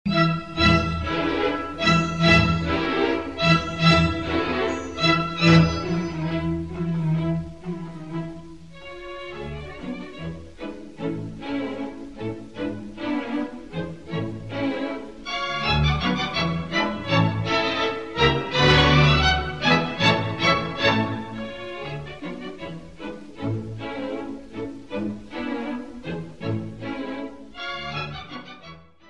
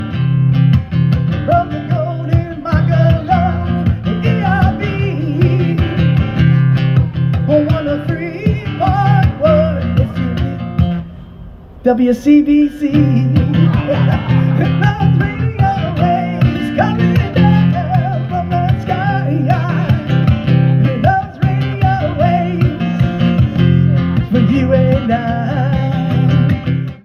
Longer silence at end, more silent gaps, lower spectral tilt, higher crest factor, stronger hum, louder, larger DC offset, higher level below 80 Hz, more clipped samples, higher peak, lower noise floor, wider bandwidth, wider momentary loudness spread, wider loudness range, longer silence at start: about the same, 0 s vs 0.05 s; neither; second, -6 dB/octave vs -9 dB/octave; first, 22 dB vs 12 dB; neither; second, -23 LUFS vs -14 LUFS; first, 0.5% vs under 0.1%; second, -38 dBFS vs -30 dBFS; neither; about the same, -2 dBFS vs 0 dBFS; first, -46 dBFS vs -33 dBFS; first, 9.2 kHz vs 6.2 kHz; first, 17 LU vs 6 LU; first, 13 LU vs 2 LU; about the same, 0.05 s vs 0 s